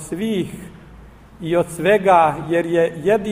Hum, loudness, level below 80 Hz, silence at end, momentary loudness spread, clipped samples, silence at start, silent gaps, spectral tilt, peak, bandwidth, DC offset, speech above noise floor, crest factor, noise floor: none; -18 LUFS; -48 dBFS; 0 s; 14 LU; under 0.1%; 0 s; none; -6 dB/octave; -2 dBFS; 15.5 kHz; under 0.1%; 25 dB; 18 dB; -42 dBFS